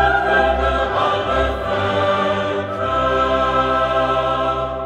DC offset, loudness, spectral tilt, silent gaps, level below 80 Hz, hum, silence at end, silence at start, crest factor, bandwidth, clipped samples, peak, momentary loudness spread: under 0.1%; -18 LUFS; -6 dB/octave; none; -32 dBFS; none; 0 s; 0 s; 14 dB; 10 kHz; under 0.1%; -4 dBFS; 5 LU